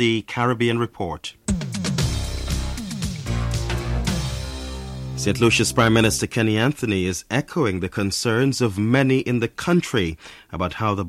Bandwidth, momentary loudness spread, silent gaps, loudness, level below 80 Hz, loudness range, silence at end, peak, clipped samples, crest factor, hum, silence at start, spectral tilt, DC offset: 16 kHz; 12 LU; none; -22 LUFS; -34 dBFS; 6 LU; 0 s; -4 dBFS; under 0.1%; 18 dB; none; 0 s; -5 dB/octave; under 0.1%